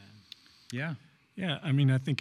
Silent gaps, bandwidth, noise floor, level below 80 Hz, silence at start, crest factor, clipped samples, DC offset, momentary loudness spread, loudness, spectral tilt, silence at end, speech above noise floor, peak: none; 10.5 kHz; -55 dBFS; -74 dBFS; 0 s; 18 dB; under 0.1%; under 0.1%; 24 LU; -31 LUFS; -7 dB/octave; 0 s; 26 dB; -14 dBFS